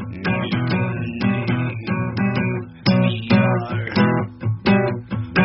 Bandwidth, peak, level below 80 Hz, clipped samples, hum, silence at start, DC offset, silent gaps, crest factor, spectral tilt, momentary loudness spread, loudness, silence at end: 6 kHz; -4 dBFS; -48 dBFS; under 0.1%; none; 0 s; under 0.1%; none; 16 dB; -6 dB/octave; 6 LU; -20 LUFS; 0 s